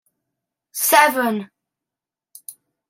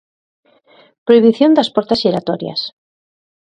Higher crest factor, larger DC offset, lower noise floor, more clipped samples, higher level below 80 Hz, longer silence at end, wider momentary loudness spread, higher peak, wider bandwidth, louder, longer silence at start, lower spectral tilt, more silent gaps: first, 22 dB vs 16 dB; neither; first, -88 dBFS vs -50 dBFS; neither; second, -76 dBFS vs -58 dBFS; second, 0.4 s vs 0.8 s; first, 25 LU vs 13 LU; about the same, 0 dBFS vs 0 dBFS; first, 16.5 kHz vs 9.2 kHz; second, -17 LUFS vs -14 LUFS; second, 0.75 s vs 1.05 s; second, -2 dB/octave vs -6.5 dB/octave; neither